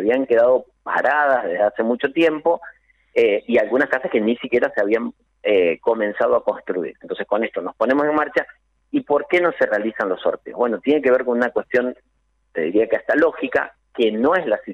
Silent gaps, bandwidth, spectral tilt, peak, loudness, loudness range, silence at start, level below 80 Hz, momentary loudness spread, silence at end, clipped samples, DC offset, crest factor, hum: none; 7.2 kHz; -6.5 dB/octave; -6 dBFS; -20 LUFS; 2 LU; 0 s; -60 dBFS; 8 LU; 0 s; under 0.1%; under 0.1%; 14 dB; none